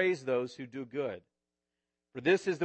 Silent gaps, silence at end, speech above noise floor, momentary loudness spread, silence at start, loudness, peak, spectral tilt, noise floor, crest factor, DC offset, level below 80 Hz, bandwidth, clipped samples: none; 0 s; 56 dB; 16 LU; 0 s; -33 LUFS; -14 dBFS; -5.5 dB/octave; -88 dBFS; 18 dB; under 0.1%; -80 dBFS; 8.6 kHz; under 0.1%